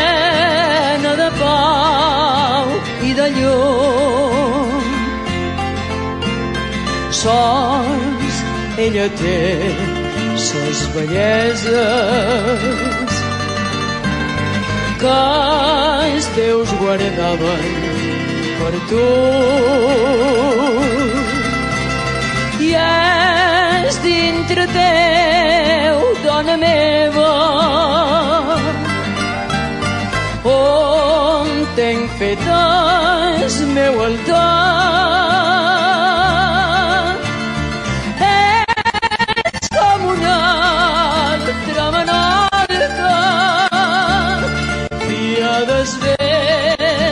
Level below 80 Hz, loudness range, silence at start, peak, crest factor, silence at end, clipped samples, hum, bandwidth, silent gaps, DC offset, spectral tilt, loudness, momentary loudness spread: -34 dBFS; 4 LU; 0 s; -2 dBFS; 12 dB; 0 s; under 0.1%; none; 11.5 kHz; none; under 0.1%; -4.5 dB/octave; -14 LUFS; 7 LU